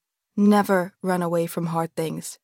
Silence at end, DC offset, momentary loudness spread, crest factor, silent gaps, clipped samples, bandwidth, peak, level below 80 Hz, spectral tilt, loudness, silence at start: 0.1 s; under 0.1%; 10 LU; 16 dB; none; under 0.1%; 17 kHz; -8 dBFS; -74 dBFS; -6.5 dB/octave; -23 LUFS; 0.35 s